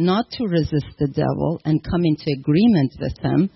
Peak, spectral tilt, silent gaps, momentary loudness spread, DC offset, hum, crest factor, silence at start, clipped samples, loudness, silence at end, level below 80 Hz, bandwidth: -6 dBFS; -9.5 dB/octave; none; 7 LU; under 0.1%; none; 12 dB; 0 s; under 0.1%; -20 LUFS; 0.05 s; -42 dBFS; 6 kHz